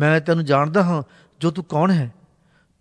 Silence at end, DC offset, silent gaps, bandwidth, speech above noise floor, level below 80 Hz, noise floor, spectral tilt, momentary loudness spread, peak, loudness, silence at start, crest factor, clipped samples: 0.7 s; under 0.1%; none; 10.5 kHz; 41 dB; -62 dBFS; -60 dBFS; -7.5 dB/octave; 9 LU; -4 dBFS; -20 LUFS; 0 s; 16 dB; under 0.1%